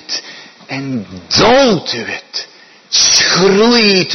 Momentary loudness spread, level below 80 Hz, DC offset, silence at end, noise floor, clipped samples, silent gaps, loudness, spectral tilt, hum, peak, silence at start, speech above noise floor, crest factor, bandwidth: 16 LU; -44 dBFS; under 0.1%; 0 s; -35 dBFS; under 0.1%; none; -10 LUFS; -2.5 dB/octave; none; 0 dBFS; 0.1 s; 23 dB; 12 dB; 11 kHz